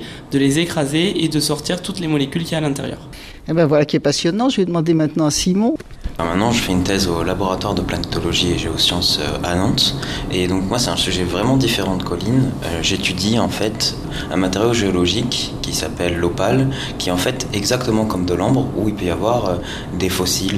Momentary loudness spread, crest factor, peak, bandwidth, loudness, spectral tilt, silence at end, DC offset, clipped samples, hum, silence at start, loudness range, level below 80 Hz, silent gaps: 6 LU; 16 dB; -2 dBFS; 15.5 kHz; -18 LUFS; -4.5 dB/octave; 0 s; under 0.1%; under 0.1%; none; 0 s; 2 LU; -36 dBFS; none